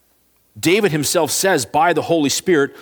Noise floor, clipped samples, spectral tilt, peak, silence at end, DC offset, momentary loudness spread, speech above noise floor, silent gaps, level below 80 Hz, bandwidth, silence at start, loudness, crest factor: -59 dBFS; under 0.1%; -3.5 dB/octave; -2 dBFS; 0 s; under 0.1%; 2 LU; 43 dB; none; -58 dBFS; over 20 kHz; 0.55 s; -16 LUFS; 16 dB